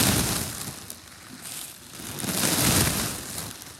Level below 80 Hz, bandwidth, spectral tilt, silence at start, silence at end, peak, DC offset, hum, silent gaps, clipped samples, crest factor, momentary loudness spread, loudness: -44 dBFS; 17 kHz; -2.5 dB/octave; 0 s; 0 s; -6 dBFS; under 0.1%; none; none; under 0.1%; 22 dB; 19 LU; -25 LUFS